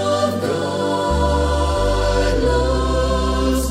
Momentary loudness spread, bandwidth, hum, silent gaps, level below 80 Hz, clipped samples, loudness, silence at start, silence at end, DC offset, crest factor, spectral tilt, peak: 3 LU; 15.5 kHz; none; none; -22 dBFS; under 0.1%; -19 LUFS; 0 s; 0 s; under 0.1%; 12 dB; -5.5 dB/octave; -6 dBFS